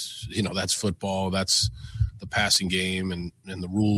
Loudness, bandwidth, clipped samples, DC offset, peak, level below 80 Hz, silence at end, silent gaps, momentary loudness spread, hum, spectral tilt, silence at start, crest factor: -25 LUFS; 15 kHz; under 0.1%; under 0.1%; -10 dBFS; -42 dBFS; 0 s; none; 10 LU; none; -3.5 dB/octave; 0 s; 16 dB